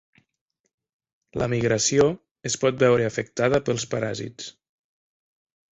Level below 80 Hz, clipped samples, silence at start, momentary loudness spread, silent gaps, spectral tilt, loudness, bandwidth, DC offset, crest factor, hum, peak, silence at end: -54 dBFS; under 0.1%; 1.35 s; 15 LU; 2.31-2.35 s; -4.5 dB/octave; -23 LUFS; 8.4 kHz; under 0.1%; 20 dB; none; -6 dBFS; 1.25 s